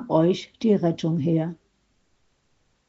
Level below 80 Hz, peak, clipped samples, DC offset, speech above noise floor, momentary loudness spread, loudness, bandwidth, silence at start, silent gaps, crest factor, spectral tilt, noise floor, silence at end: -64 dBFS; -6 dBFS; under 0.1%; under 0.1%; 46 dB; 4 LU; -23 LUFS; 7.6 kHz; 0 s; none; 18 dB; -7.5 dB/octave; -68 dBFS; 1.35 s